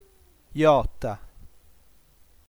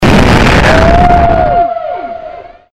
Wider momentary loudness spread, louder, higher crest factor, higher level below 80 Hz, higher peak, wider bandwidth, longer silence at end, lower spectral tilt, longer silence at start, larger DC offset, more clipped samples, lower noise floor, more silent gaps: about the same, 18 LU vs 16 LU; second, -23 LUFS vs -7 LUFS; first, 20 dB vs 8 dB; second, -42 dBFS vs -16 dBFS; second, -8 dBFS vs 0 dBFS; first, over 20 kHz vs 15 kHz; first, 1.05 s vs 0 s; about the same, -7 dB/octave vs -6 dB/octave; first, 0.55 s vs 0 s; neither; second, under 0.1% vs 0.7%; first, -58 dBFS vs -27 dBFS; neither